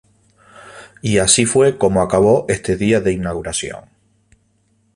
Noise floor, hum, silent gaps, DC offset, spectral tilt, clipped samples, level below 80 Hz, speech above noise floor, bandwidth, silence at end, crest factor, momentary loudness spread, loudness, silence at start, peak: -61 dBFS; none; none; under 0.1%; -4 dB/octave; under 0.1%; -42 dBFS; 45 dB; 11.5 kHz; 1.15 s; 18 dB; 11 LU; -15 LUFS; 0.65 s; 0 dBFS